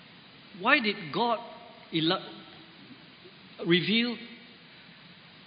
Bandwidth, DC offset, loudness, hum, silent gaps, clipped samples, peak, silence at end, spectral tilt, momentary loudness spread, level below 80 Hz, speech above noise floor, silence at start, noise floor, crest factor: 5.2 kHz; under 0.1%; -27 LUFS; none; none; under 0.1%; -6 dBFS; 0.35 s; -9 dB/octave; 26 LU; -76 dBFS; 24 dB; 0.55 s; -52 dBFS; 24 dB